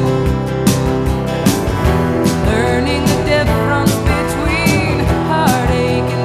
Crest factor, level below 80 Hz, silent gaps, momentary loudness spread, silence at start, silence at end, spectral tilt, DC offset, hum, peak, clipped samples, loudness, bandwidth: 14 dB; -24 dBFS; none; 3 LU; 0 s; 0 s; -5.5 dB/octave; under 0.1%; none; 0 dBFS; under 0.1%; -14 LUFS; 15.5 kHz